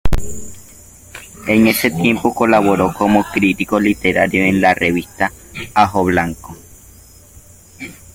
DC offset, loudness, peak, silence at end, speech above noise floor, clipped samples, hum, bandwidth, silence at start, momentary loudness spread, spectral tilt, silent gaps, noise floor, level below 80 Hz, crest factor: under 0.1%; -15 LUFS; 0 dBFS; 0.2 s; 28 dB; under 0.1%; none; 17 kHz; 0.05 s; 20 LU; -5.5 dB/octave; none; -42 dBFS; -32 dBFS; 16 dB